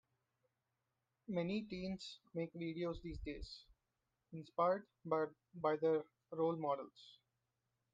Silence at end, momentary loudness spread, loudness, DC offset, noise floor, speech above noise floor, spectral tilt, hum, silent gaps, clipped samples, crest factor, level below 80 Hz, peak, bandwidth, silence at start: 0.8 s; 17 LU; -42 LUFS; under 0.1%; -89 dBFS; 47 dB; -7 dB/octave; none; none; under 0.1%; 20 dB; -64 dBFS; -24 dBFS; 9 kHz; 1.3 s